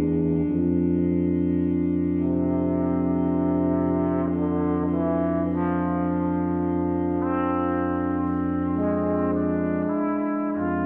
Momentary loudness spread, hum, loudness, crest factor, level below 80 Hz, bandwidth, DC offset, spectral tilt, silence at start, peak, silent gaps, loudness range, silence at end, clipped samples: 2 LU; none; -24 LUFS; 12 dB; -46 dBFS; 3.3 kHz; under 0.1%; -12.5 dB/octave; 0 s; -12 dBFS; none; 1 LU; 0 s; under 0.1%